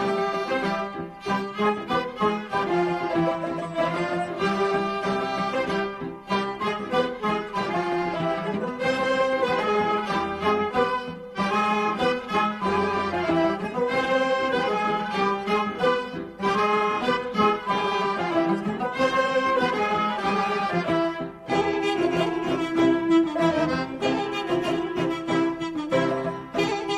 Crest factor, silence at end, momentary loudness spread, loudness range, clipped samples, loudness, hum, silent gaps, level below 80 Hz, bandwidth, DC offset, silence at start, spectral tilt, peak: 16 dB; 0 s; 5 LU; 2 LU; under 0.1%; -25 LUFS; none; none; -56 dBFS; 12 kHz; under 0.1%; 0 s; -5.5 dB/octave; -8 dBFS